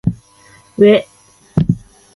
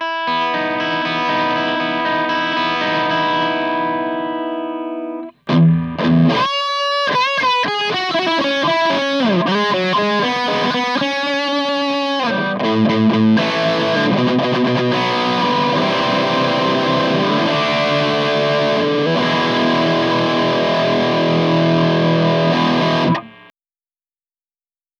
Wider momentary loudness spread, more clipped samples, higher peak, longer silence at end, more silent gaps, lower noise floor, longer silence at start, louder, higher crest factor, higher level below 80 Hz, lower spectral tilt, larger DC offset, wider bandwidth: first, 19 LU vs 4 LU; neither; first, 0 dBFS vs -4 dBFS; second, 0.4 s vs 1.7 s; neither; second, -46 dBFS vs under -90 dBFS; about the same, 0.05 s vs 0 s; about the same, -15 LUFS vs -16 LUFS; about the same, 16 dB vs 14 dB; first, -40 dBFS vs -56 dBFS; first, -8 dB/octave vs -6 dB/octave; neither; first, 11.5 kHz vs 10 kHz